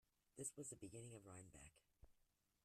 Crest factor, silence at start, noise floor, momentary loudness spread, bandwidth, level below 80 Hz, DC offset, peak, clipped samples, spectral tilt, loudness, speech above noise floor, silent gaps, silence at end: 24 dB; 0.35 s; -84 dBFS; 14 LU; 14 kHz; -78 dBFS; under 0.1%; -36 dBFS; under 0.1%; -4.5 dB/octave; -56 LUFS; 26 dB; none; 0.45 s